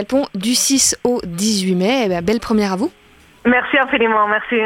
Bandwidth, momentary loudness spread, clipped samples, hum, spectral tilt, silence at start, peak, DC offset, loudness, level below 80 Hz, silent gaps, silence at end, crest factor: 17 kHz; 6 LU; under 0.1%; none; -3 dB/octave; 0 s; -2 dBFS; under 0.1%; -16 LUFS; -46 dBFS; none; 0 s; 16 dB